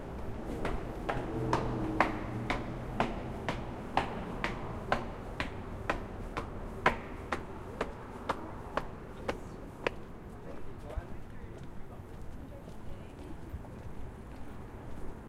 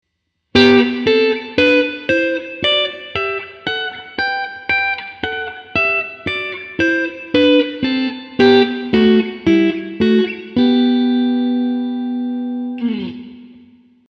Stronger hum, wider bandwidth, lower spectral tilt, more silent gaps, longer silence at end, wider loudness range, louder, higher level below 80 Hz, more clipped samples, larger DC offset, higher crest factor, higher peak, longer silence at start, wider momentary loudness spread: neither; first, 15.5 kHz vs 7 kHz; about the same, -6 dB/octave vs -6 dB/octave; neither; second, 0 s vs 0.6 s; first, 12 LU vs 5 LU; second, -38 LUFS vs -16 LUFS; about the same, -46 dBFS vs -50 dBFS; neither; neither; first, 30 dB vs 16 dB; second, -6 dBFS vs 0 dBFS; second, 0 s vs 0.55 s; first, 15 LU vs 10 LU